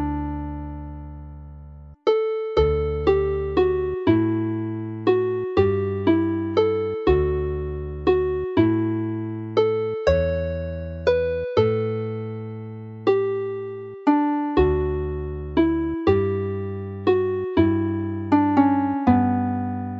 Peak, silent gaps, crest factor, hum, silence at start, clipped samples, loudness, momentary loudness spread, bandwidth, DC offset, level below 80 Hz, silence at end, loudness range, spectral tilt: -4 dBFS; none; 18 dB; none; 0 s; under 0.1%; -22 LUFS; 11 LU; 6.6 kHz; under 0.1%; -36 dBFS; 0 s; 3 LU; -9 dB/octave